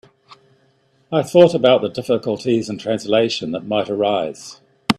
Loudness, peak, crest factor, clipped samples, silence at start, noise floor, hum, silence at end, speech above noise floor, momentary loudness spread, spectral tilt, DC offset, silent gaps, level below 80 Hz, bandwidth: -18 LUFS; 0 dBFS; 18 dB; under 0.1%; 0.3 s; -59 dBFS; none; 0.05 s; 42 dB; 12 LU; -5.5 dB/octave; under 0.1%; none; -58 dBFS; 13 kHz